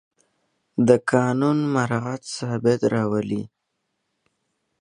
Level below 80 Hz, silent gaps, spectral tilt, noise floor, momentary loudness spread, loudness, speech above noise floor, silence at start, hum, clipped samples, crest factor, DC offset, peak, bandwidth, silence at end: -62 dBFS; none; -6.5 dB/octave; -76 dBFS; 11 LU; -22 LUFS; 55 dB; 0.75 s; none; under 0.1%; 22 dB; under 0.1%; -2 dBFS; 11 kHz; 1.35 s